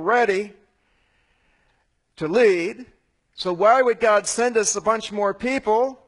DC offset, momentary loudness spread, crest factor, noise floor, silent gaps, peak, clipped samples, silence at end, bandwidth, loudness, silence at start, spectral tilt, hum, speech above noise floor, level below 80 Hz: under 0.1%; 12 LU; 18 dB; -67 dBFS; none; -4 dBFS; under 0.1%; 0.15 s; 11 kHz; -20 LUFS; 0 s; -3 dB/octave; none; 47 dB; -60 dBFS